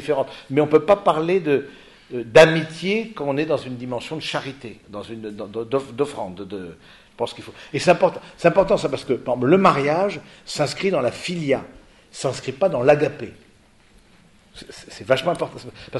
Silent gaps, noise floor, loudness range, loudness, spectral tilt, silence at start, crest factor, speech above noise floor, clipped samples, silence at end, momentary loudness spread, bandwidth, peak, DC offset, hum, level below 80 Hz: none; -53 dBFS; 9 LU; -21 LUFS; -5.5 dB/octave; 0 s; 22 dB; 33 dB; under 0.1%; 0 s; 19 LU; 11.5 kHz; 0 dBFS; under 0.1%; none; -54 dBFS